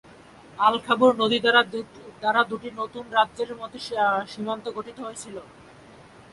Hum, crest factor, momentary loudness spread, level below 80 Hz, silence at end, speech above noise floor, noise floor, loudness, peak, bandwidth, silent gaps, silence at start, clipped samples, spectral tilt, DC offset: none; 22 dB; 17 LU; -64 dBFS; 0.9 s; 25 dB; -49 dBFS; -23 LUFS; -4 dBFS; 11.5 kHz; none; 0.55 s; under 0.1%; -3.5 dB/octave; under 0.1%